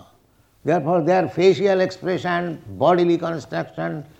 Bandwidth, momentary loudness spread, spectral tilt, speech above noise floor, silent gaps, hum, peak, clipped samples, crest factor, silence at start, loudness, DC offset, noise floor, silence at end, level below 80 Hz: 8.4 kHz; 11 LU; -7 dB/octave; 38 dB; none; none; -4 dBFS; under 0.1%; 18 dB; 0.65 s; -20 LUFS; under 0.1%; -58 dBFS; 0.15 s; -62 dBFS